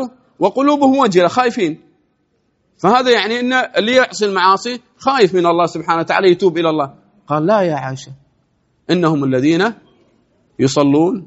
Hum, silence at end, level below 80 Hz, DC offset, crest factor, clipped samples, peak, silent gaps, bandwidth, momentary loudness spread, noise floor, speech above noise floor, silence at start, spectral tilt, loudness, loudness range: none; 0 s; -58 dBFS; under 0.1%; 16 dB; under 0.1%; 0 dBFS; none; 8 kHz; 9 LU; -63 dBFS; 49 dB; 0 s; -4 dB/octave; -14 LUFS; 4 LU